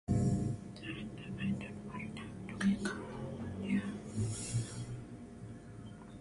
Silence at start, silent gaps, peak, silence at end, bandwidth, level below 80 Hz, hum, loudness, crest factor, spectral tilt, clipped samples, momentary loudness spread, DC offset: 0.1 s; none; -20 dBFS; 0 s; 11.5 kHz; -54 dBFS; none; -39 LUFS; 18 dB; -6 dB/octave; under 0.1%; 16 LU; under 0.1%